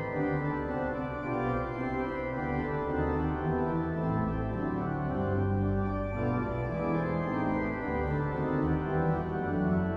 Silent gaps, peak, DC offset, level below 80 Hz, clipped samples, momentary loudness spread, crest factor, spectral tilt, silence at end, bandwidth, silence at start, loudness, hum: none; -18 dBFS; under 0.1%; -44 dBFS; under 0.1%; 3 LU; 14 dB; -10 dB/octave; 0 s; 5.6 kHz; 0 s; -31 LUFS; none